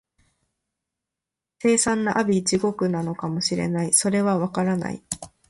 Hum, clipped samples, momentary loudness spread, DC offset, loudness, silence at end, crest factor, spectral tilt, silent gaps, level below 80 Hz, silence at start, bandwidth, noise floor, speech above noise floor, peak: none; under 0.1%; 9 LU; under 0.1%; -22 LUFS; 0.2 s; 20 dB; -4 dB/octave; none; -58 dBFS; 1.65 s; 11.5 kHz; -87 dBFS; 65 dB; -4 dBFS